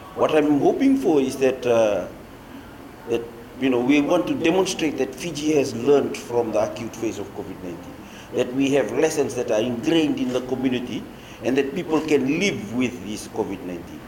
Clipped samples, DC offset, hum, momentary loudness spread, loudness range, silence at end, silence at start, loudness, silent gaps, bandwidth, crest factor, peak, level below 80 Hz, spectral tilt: under 0.1%; under 0.1%; none; 16 LU; 3 LU; 0 s; 0 s; -22 LUFS; none; 17 kHz; 16 dB; -6 dBFS; -52 dBFS; -5 dB/octave